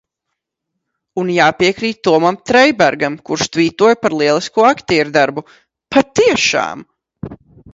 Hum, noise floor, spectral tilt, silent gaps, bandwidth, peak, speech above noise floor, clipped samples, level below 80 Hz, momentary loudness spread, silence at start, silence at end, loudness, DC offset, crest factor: none; -77 dBFS; -4 dB/octave; none; 8 kHz; 0 dBFS; 63 dB; under 0.1%; -52 dBFS; 15 LU; 1.15 s; 0.4 s; -14 LUFS; under 0.1%; 14 dB